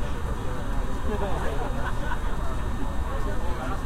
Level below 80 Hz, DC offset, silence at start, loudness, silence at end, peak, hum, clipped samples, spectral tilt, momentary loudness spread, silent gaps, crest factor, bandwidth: -30 dBFS; under 0.1%; 0 s; -31 LUFS; 0 s; -14 dBFS; none; under 0.1%; -6 dB/octave; 3 LU; none; 12 dB; 13.5 kHz